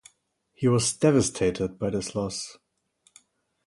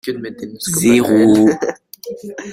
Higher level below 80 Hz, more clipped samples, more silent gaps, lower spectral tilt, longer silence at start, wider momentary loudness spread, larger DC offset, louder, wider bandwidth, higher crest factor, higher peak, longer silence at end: about the same, -54 dBFS vs -52 dBFS; neither; neither; about the same, -5 dB/octave vs -5 dB/octave; first, 0.6 s vs 0.05 s; second, 10 LU vs 19 LU; neither; second, -25 LUFS vs -14 LUFS; second, 11.5 kHz vs 16 kHz; first, 20 dB vs 14 dB; second, -8 dBFS vs -2 dBFS; first, 1.15 s vs 0 s